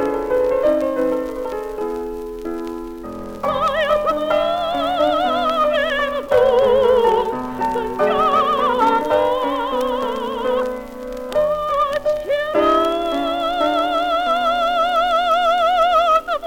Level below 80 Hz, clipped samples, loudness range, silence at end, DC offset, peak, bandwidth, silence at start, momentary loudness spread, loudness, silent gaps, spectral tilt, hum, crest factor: -44 dBFS; under 0.1%; 5 LU; 0 s; under 0.1%; -4 dBFS; 17.5 kHz; 0 s; 11 LU; -18 LUFS; none; -4.5 dB/octave; none; 16 dB